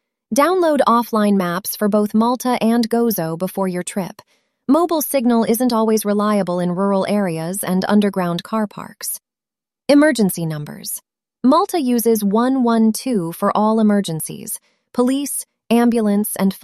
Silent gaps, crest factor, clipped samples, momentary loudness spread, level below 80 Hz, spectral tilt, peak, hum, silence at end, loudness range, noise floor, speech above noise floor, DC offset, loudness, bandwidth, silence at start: none; 16 dB; under 0.1%; 11 LU; -62 dBFS; -5.5 dB/octave; -2 dBFS; none; 0.05 s; 3 LU; -89 dBFS; 72 dB; under 0.1%; -18 LUFS; 15 kHz; 0.3 s